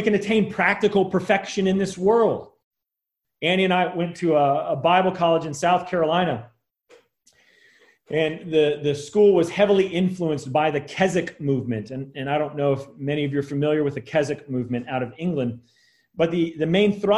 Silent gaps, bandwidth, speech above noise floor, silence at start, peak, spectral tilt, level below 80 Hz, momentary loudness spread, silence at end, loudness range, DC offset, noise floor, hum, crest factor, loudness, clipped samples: 2.64-2.71 s; 12 kHz; 63 dB; 0 s; -4 dBFS; -6 dB/octave; -60 dBFS; 8 LU; 0 s; 4 LU; under 0.1%; -84 dBFS; none; 18 dB; -22 LUFS; under 0.1%